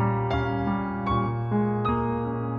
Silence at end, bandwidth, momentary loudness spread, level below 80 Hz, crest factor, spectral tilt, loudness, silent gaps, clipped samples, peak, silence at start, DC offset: 0 s; 5.4 kHz; 3 LU; -42 dBFS; 12 dB; -9.5 dB/octave; -26 LUFS; none; under 0.1%; -12 dBFS; 0 s; under 0.1%